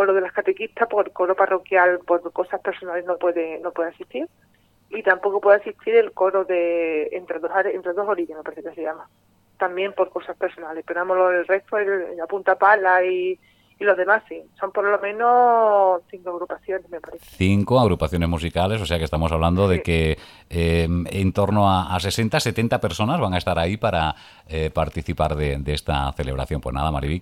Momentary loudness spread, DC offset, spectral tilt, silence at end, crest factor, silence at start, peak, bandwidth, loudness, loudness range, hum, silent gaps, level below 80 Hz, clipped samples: 12 LU; under 0.1%; -6 dB/octave; 0 s; 20 dB; 0 s; -2 dBFS; 16 kHz; -21 LUFS; 5 LU; none; none; -38 dBFS; under 0.1%